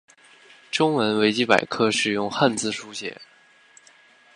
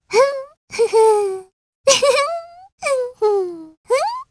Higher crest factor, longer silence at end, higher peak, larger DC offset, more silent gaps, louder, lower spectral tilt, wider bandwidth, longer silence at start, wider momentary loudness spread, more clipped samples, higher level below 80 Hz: first, 24 dB vs 18 dB; first, 1.1 s vs 0.05 s; about the same, 0 dBFS vs 0 dBFS; neither; second, none vs 0.57-0.68 s, 1.53-1.84 s, 2.72-2.78 s, 3.77-3.84 s; second, -22 LUFS vs -17 LUFS; first, -4 dB/octave vs -1 dB/octave; about the same, 11 kHz vs 11 kHz; first, 0.75 s vs 0.1 s; second, 12 LU vs 16 LU; neither; about the same, -66 dBFS vs -62 dBFS